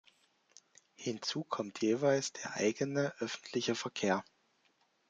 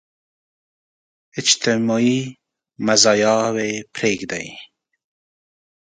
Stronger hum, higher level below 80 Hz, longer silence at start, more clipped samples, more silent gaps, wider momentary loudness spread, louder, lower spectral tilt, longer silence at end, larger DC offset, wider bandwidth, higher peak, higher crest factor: neither; second, -80 dBFS vs -62 dBFS; second, 1 s vs 1.35 s; neither; neither; second, 8 LU vs 15 LU; second, -35 LUFS vs -18 LUFS; about the same, -4 dB/octave vs -3 dB/octave; second, 0.9 s vs 1.3 s; neither; about the same, 9.4 kHz vs 9.6 kHz; second, -16 dBFS vs 0 dBFS; about the same, 20 dB vs 22 dB